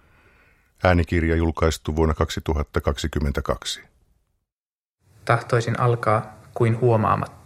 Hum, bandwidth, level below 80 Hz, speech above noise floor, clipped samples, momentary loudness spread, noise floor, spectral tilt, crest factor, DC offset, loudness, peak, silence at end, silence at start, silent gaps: none; 15 kHz; -34 dBFS; over 69 dB; under 0.1%; 7 LU; under -90 dBFS; -6.5 dB/octave; 22 dB; under 0.1%; -22 LUFS; -2 dBFS; 0.1 s; 0.8 s; 4.52-4.98 s